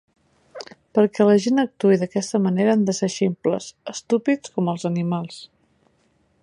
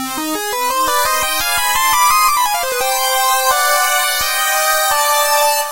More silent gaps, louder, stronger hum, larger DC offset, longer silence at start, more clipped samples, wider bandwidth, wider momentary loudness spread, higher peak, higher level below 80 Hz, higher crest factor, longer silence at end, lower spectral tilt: neither; second, -21 LUFS vs -13 LUFS; neither; neither; first, 0.55 s vs 0 s; neither; second, 11 kHz vs 16.5 kHz; first, 17 LU vs 5 LU; second, -4 dBFS vs 0 dBFS; second, -66 dBFS vs -44 dBFS; about the same, 18 dB vs 14 dB; first, 1 s vs 0 s; first, -6 dB/octave vs 1 dB/octave